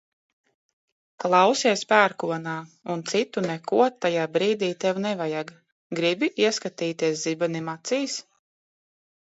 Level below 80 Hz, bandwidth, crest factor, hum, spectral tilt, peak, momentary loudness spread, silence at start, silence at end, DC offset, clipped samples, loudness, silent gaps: -76 dBFS; 8.2 kHz; 22 dB; none; -4 dB/octave; -2 dBFS; 12 LU; 1.2 s; 1.05 s; under 0.1%; under 0.1%; -24 LUFS; 5.72-5.90 s